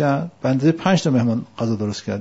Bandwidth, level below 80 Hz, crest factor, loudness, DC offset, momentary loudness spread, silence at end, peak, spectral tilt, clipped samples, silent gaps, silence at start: 8 kHz; -58 dBFS; 16 dB; -20 LUFS; 0.1%; 7 LU; 0 s; -2 dBFS; -6.5 dB/octave; under 0.1%; none; 0 s